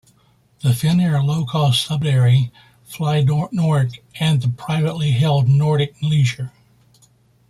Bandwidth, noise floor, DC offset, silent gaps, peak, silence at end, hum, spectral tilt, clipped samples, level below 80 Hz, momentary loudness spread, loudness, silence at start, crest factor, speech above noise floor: 13.5 kHz; -57 dBFS; under 0.1%; none; -6 dBFS; 1 s; none; -6.5 dB/octave; under 0.1%; -52 dBFS; 8 LU; -18 LUFS; 0.65 s; 12 dB; 40 dB